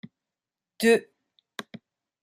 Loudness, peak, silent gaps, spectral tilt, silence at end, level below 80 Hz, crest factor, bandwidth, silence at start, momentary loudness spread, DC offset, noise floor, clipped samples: -23 LUFS; -8 dBFS; none; -4 dB/octave; 1.2 s; -76 dBFS; 22 dB; 15.5 kHz; 0.8 s; 20 LU; under 0.1%; -90 dBFS; under 0.1%